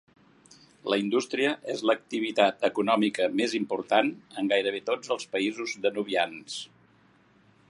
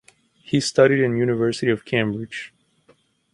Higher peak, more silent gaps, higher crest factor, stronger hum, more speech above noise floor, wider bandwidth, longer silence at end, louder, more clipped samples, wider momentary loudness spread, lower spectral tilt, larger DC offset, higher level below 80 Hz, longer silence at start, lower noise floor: about the same, -6 dBFS vs -4 dBFS; neither; about the same, 22 dB vs 18 dB; neither; second, 34 dB vs 40 dB; about the same, 11.5 kHz vs 11.5 kHz; first, 1.05 s vs 0.85 s; second, -27 LUFS vs -20 LUFS; neither; second, 7 LU vs 15 LU; second, -4 dB/octave vs -5.5 dB/octave; neither; second, -78 dBFS vs -60 dBFS; first, 0.85 s vs 0.5 s; about the same, -61 dBFS vs -59 dBFS